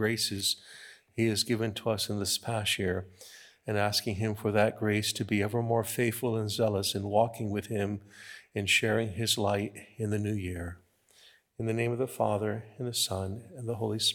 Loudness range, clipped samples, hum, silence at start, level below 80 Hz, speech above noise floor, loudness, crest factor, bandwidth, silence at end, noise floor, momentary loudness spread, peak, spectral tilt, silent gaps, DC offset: 4 LU; under 0.1%; none; 0 s; -68 dBFS; 31 dB; -30 LUFS; 20 dB; 19 kHz; 0 s; -61 dBFS; 12 LU; -10 dBFS; -4 dB/octave; none; under 0.1%